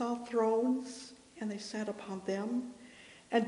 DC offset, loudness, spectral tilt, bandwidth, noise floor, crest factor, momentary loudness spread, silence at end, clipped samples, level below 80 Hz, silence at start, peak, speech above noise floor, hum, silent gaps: under 0.1%; -36 LUFS; -5 dB/octave; 10.5 kHz; -56 dBFS; 18 dB; 20 LU; 0 s; under 0.1%; -78 dBFS; 0 s; -16 dBFS; 18 dB; none; none